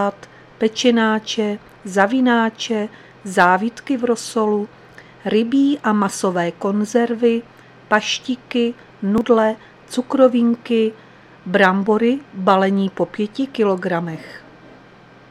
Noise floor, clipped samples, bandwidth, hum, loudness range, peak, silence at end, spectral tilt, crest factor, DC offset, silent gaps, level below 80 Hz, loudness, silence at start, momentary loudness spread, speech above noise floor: -45 dBFS; under 0.1%; 13 kHz; none; 2 LU; 0 dBFS; 0.9 s; -5 dB/octave; 18 dB; under 0.1%; none; -60 dBFS; -18 LUFS; 0 s; 10 LU; 28 dB